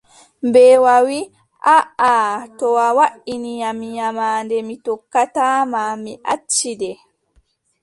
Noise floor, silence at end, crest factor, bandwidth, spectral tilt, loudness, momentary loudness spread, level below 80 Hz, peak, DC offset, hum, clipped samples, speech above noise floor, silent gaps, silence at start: -60 dBFS; 0.9 s; 16 dB; 11.5 kHz; -2.5 dB/octave; -16 LUFS; 14 LU; -64 dBFS; -2 dBFS; under 0.1%; none; under 0.1%; 44 dB; none; 0.45 s